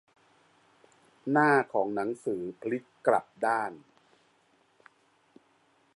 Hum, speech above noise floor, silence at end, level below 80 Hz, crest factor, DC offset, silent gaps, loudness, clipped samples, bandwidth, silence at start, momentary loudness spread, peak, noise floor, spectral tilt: none; 39 dB; 2.2 s; -80 dBFS; 22 dB; under 0.1%; none; -29 LUFS; under 0.1%; 11.5 kHz; 1.25 s; 12 LU; -10 dBFS; -67 dBFS; -7 dB/octave